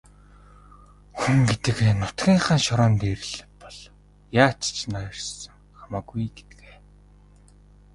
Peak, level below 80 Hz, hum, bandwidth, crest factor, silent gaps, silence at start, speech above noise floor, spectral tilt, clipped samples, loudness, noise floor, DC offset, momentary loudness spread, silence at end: -2 dBFS; -46 dBFS; 50 Hz at -45 dBFS; 11.5 kHz; 22 dB; none; 1.15 s; 30 dB; -5 dB/octave; under 0.1%; -23 LUFS; -52 dBFS; under 0.1%; 22 LU; 1.55 s